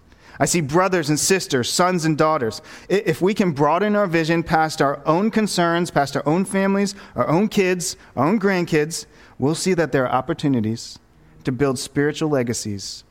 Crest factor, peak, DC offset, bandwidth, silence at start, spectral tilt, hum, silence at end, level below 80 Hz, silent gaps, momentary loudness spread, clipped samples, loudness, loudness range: 18 dB; -2 dBFS; 0.1%; 16.5 kHz; 0.35 s; -5 dB/octave; none; 0.1 s; -50 dBFS; none; 7 LU; under 0.1%; -20 LUFS; 3 LU